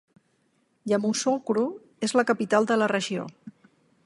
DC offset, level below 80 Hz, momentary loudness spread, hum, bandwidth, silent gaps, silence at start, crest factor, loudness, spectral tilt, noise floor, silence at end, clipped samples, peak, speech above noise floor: under 0.1%; -76 dBFS; 9 LU; none; 11.5 kHz; none; 0.85 s; 20 dB; -25 LUFS; -4 dB/octave; -69 dBFS; 0.55 s; under 0.1%; -8 dBFS; 45 dB